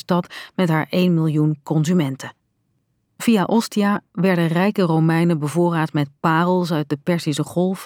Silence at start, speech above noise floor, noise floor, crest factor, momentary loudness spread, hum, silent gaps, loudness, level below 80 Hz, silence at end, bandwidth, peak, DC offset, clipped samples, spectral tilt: 0.1 s; 50 dB; -68 dBFS; 16 dB; 5 LU; none; none; -19 LUFS; -68 dBFS; 0 s; 16.5 kHz; -4 dBFS; under 0.1%; under 0.1%; -6.5 dB/octave